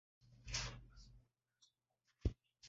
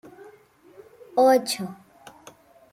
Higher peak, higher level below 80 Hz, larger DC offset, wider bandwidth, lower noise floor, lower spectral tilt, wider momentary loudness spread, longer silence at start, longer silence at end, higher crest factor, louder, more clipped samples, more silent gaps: second, -24 dBFS vs -8 dBFS; first, -54 dBFS vs -74 dBFS; neither; second, 7.6 kHz vs 16 kHz; first, -86 dBFS vs -53 dBFS; about the same, -4 dB/octave vs -3.5 dB/octave; about the same, 20 LU vs 19 LU; second, 0.25 s vs 1.15 s; second, 0 s vs 1 s; first, 26 dB vs 18 dB; second, -46 LUFS vs -22 LUFS; neither; neither